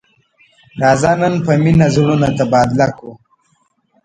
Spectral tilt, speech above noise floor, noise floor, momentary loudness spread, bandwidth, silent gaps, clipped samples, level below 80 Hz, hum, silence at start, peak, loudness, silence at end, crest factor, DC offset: -7 dB/octave; 48 dB; -60 dBFS; 6 LU; 9.2 kHz; none; under 0.1%; -42 dBFS; none; 0.75 s; 0 dBFS; -13 LUFS; 0.9 s; 14 dB; under 0.1%